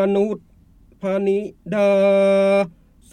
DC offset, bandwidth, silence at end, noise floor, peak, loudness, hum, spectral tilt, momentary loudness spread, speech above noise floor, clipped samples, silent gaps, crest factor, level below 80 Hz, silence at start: under 0.1%; 9.6 kHz; 0.45 s; -51 dBFS; -6 dBFS; -19 LUFS; none; -7 dB/octave; 12 LU; 33 dB; under 0.1%; none; 12 dB; -56 dBFS; 0 s